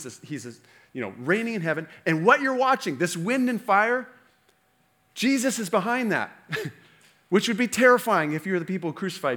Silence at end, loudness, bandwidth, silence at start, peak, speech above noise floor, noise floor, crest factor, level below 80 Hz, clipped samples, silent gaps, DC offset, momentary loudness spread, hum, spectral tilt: 0 s; -24 LUFS; over 20 kHz; 0 s; -4 dBFS; 41 dB; -66 dBFS; 20 dB; -76 dBFS; under 0.1%; none; under 0.1%; 17 LU; none; -4.5 dB/octave